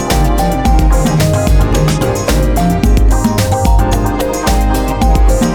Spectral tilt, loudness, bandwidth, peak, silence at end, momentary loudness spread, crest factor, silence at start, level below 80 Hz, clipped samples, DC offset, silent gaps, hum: -6 dB/octave; -12 LUFS; 18.5 kHz; 0 dBFS; 0 s; 2 LU; 10 dB; 0 s; -12 dBFS; under 0.1%; under 0.1%; none; none